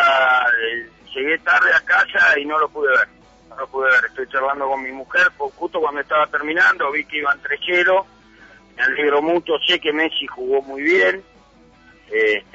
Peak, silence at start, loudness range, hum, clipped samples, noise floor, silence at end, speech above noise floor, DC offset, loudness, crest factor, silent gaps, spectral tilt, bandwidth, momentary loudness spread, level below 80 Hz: -6 dBFS; 0 s; 3 LU; none; under 0.1%; -50 dBFS; 0.15 s; 32 dB; under 0.1%; -17 LUFS; 12 dB; none; -3 dB/octave; 8 kHz; 10 LU; -58 dBFS